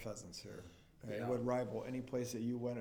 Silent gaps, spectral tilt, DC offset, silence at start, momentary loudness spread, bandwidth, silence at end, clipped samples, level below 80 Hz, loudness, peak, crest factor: none; -6 dB/octave; under 0.1%; 0 s; 16 LU; 18 kHz; 0 s; under 0.1%; -68 dBFS; -42 LUFS; -26 dBFS; 16 dB